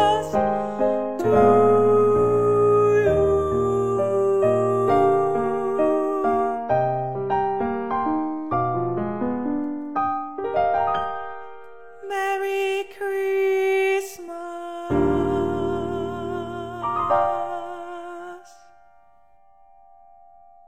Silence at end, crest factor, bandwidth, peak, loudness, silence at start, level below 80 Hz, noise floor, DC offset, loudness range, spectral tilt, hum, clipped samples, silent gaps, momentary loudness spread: 0 s; 18 dB; 15 kHz; -4 dBFS; -22 LUFS; 0 s; -48 dBFS; -57 dBFS; 0.5%; 9 LU; -7 dB/octave; none; under 0.1%; none; 14 LU